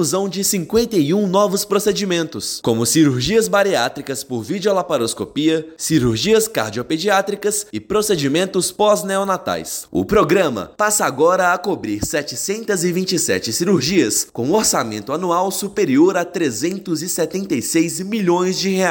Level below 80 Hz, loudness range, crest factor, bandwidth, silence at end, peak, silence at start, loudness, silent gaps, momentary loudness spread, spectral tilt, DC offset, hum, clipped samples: -48 dBFS; 1 LU; 14 dB; 17 kHz; 0 s; -4 dBFS; 0 s; -18 LUFS; none; 7 LU; -4 dB/octave; under 0.1%; none; under 0.1%